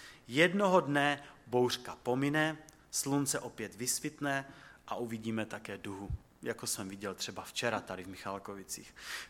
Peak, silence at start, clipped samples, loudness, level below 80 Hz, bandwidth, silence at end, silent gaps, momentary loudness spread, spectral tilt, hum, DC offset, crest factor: -12 dBFS; 0 s; under 0.1%; -35 LUFS; -58 dBFS; 17 kHz; 0 s; none; 14 LU; -3.5 dB/octave; none; under 0.1%; 24 dB